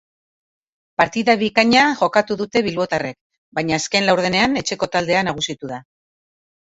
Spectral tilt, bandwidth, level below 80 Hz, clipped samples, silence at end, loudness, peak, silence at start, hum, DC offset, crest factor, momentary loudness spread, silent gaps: -4 dB/octave; 8 kHz; -54 dBFS; under 0.1%; 0.85 s; -18 LUFS; 0 dBFS; 1 s; none; under 0.1%; 20 dB; 14 LU; 3.21-3.30 s, 3.38-3.52 s